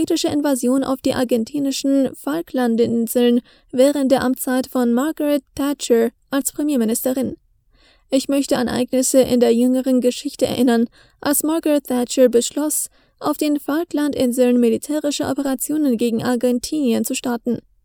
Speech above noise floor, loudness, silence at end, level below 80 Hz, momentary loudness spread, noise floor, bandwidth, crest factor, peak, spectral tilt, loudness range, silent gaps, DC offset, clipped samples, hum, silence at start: 37 dB; -19 LUFS; 0.25 s; -54 dBFS; 7 LU; -55 dBFS; over 20 kHz; 16 dB; -2 dBFS; -4 dB/octave; 3 LU; none; under 0.1%; under 0.1%; none; 0 s